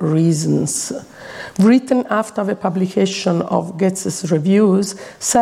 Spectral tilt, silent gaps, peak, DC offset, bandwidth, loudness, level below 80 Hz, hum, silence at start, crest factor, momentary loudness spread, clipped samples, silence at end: -5.5 dB/octave; none; -2 dBFS; under 0.1%; 15.5 kHz; -17 LUFS; -58 dBFS; none; 0 s; 14 dB; 12 LU; under 0.1%; 0 s